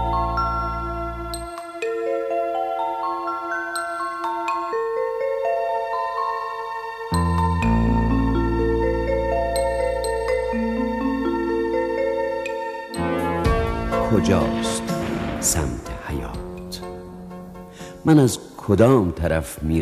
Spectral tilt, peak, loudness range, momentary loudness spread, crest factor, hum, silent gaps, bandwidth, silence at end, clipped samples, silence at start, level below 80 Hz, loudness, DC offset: -5.5 dB/octave; -4 dBFS; 4 LU; 11 LU; 18 dB; none; none; 15 kHz; 0 s; under 0.1%; 0 s; -32 dBFS; -23 LUFS; under 0.1%